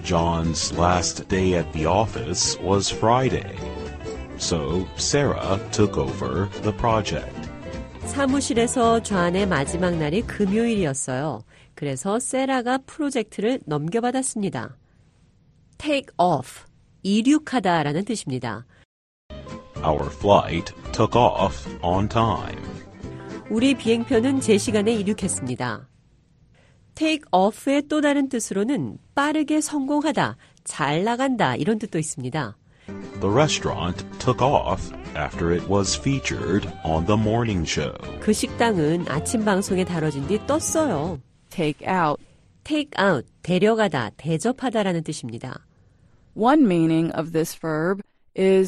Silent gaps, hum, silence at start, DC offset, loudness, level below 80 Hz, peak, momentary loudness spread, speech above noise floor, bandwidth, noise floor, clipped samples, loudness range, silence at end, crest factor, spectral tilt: 18.85-19.29 s; none; 0 s; under 0.1%; -23 LUFS; -42 dBFS; -2 dBFS; 13 LU; 35 dB; 12 kHz; -57 dBFS; under 0.1%; 3 LU; 0 s; 20 dB; -5 dB/octave